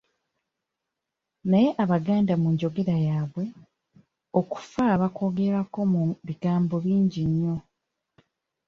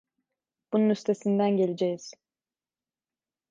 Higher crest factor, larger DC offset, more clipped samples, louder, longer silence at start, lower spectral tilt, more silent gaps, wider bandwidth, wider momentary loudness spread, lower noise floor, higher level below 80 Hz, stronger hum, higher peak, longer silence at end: about the same, 16 dB vs 16 dB; neither; neither; about the same, -25 LUFS vs -26 LUFS; first, 1.45 s vs 0.7 s; first, -9 dB/octave vs -7 dB/octave; neither; about the same, 7 kHz vs 7.6 kHz; about the same, 8 LU vs 9 LU; second, -85 dBFS vs under -90 dBFS; first, -58 dBFS vs -80 dBFS; neither; first, -8 dBFS vs -14 dBFS; second, 1.05 s vs 1.4 s